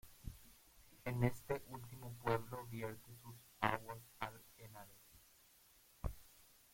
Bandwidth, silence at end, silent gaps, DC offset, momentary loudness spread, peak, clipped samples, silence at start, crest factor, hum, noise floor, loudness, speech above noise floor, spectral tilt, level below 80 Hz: 16.5 kHz; 0.2 s; none; under 0.1%; 25 LU; -16 dBFS; under 0.1%; 0.05 s; 30 dB; none; -69 dBFS; -44 LUFS; 26 dB; -6 dB/octave; -60 dBFS